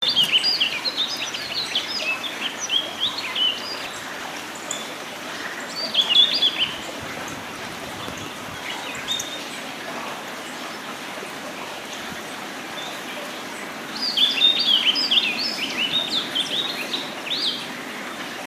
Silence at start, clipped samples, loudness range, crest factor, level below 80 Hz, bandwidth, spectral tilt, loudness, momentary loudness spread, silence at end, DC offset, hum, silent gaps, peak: 0 s; under 0.1%; 12 LU; 20 dB; -66 dBFS; 15.5 kHz; -1 dB/octave; -22 LUFS; 15 LU; 0 s; under 0.1%; none; none; -4 dBFS